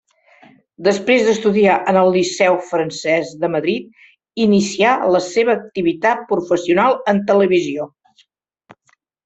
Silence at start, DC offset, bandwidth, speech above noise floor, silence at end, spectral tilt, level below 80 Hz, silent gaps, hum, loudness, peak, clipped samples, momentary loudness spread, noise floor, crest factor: 0.8 s; under 0.1%; 8.2 kHz; 46 dB; 1.4 s; -5 dB/octave; -60 dBFS; none; none; -16 LUFS; -2 dBFS; under 0.1%; 7 LU; -61 dBFS; 16 dB